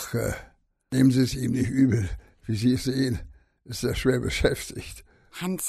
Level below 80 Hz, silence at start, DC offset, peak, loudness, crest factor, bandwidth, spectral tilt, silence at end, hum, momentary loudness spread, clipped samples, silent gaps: -42 dBFS; 0 s; under 0.1%; -8 dBFS; -25 LUFS; 18 dB; 14.5 kHz; -5.5 dB/octave; 0 s; none; 17 LU; under 0.1%; none